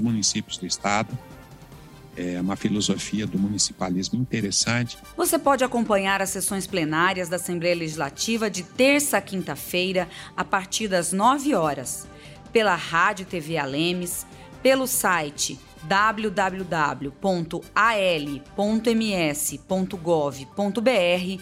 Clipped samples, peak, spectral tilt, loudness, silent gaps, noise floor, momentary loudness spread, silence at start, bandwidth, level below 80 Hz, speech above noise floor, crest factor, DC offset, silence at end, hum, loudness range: under 0.1%; -8 dBFS; -3.5 dB/octave; -24 LUFS; none; -45 dBFS; 9 LU; 0 s; 16 kHz; -54 dBFS; 21 dB; 16 dB; under 0.1%; 0 s; none; 2 LU